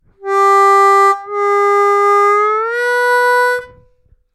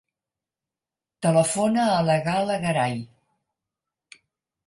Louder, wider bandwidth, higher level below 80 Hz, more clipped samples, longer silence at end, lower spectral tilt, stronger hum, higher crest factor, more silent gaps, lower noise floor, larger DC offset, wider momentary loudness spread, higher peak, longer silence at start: first, -11 LUFS vs -22 LUFS; first, 14 kHz vs 11.5 kHz; first, -58 dBFS vs -64 dBFS; neither; second, 0.7 s vs 1.6 s; second, -2 dB/octave vs -5 dB/octave; neither; second, 10 dB vs 18 dB; neither; second, -52 dBFS vs -89 dBFS; neither; about the same, 7 LU vs 7 LU; first, -2 dBFS vs -6 dBFS; second, 0.2 s vs 1.2 s